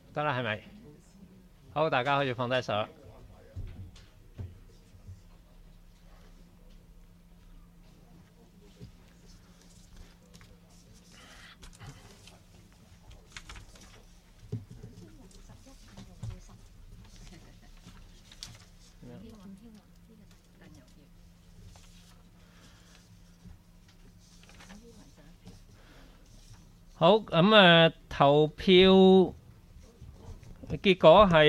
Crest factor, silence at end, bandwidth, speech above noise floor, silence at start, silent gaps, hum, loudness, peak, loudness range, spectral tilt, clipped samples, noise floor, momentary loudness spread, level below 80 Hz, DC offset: 24 dB; 0 s; 11.5 kHz; 34 dB; 0.15 s; none; none; -23 LUFS; -6 dBFS; 29 LU; -6.5 dB/octave; under 0.1%; -56 dBFS; 31 LU; -52 dBFS; under 0.1%